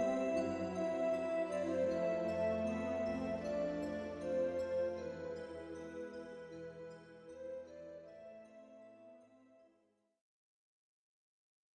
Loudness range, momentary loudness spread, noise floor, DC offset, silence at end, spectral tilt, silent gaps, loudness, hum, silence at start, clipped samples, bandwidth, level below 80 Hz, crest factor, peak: 17 LU; 19 LU; -77 dBFS; under 0.1%; 2.4 s; -6.5 dB/octave; none; -40 LUFS; none; 0 s; under 0.1%; 11 kHz; -70 dBFS; 16 dB; -26 dBFS